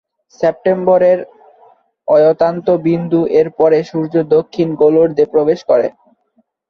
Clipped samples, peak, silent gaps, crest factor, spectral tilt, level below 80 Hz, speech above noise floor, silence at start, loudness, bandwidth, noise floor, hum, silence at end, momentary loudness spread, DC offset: under 0.1%; -2 dBFS; none; 12 dB; -8.5 dB/octave; -56 dBFS; 48 dB; 0.4 s; -13 LUFS; 6.4 kHz; -60 dBFS; none; 0.8 s; 7 LU; under 0.1%